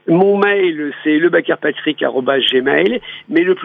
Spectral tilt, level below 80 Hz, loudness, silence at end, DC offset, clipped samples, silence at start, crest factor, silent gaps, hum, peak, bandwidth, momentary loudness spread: -7.5 dB/octave; -60 dBFS; -15 LUFS; 0 s; under 0.1%; under 0.1%; 0.05 s; 14 dB; none; none; -2 dBFS; 4.5 kHz; 6 LU